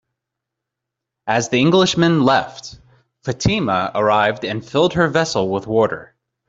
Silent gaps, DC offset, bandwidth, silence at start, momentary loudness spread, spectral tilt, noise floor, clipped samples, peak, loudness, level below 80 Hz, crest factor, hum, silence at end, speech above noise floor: none; under 0.1%; 8 kHz; 1.25 s; 16 LU; -5 dB/octave; -82 dBFS; under 0.1%; -2 dBFS; -17 LUFS; -48 dBFS; 16 dB; none; 0.45 s; 65 dB